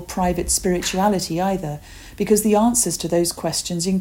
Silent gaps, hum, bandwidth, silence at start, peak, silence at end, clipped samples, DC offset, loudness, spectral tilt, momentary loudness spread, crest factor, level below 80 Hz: none; none; 17 kHz; 0 s; -4 dBFS; 0 s; under 0.1%; under 0.1%; -20 LUFS; -4 dB/octave; 9 LU; 16 dB; -40 dBFS